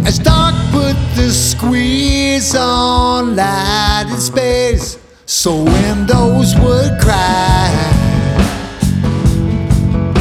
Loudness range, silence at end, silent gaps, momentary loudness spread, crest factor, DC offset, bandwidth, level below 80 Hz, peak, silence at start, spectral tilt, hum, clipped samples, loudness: 2 LU; 0 s; none; 5 LU; 12 dB; under 0.1%; 16.5 kHz; -20 dBFS; 0 dBFS; 0 s; -5 dB/octave; none; under 0.1%; -12 LUFS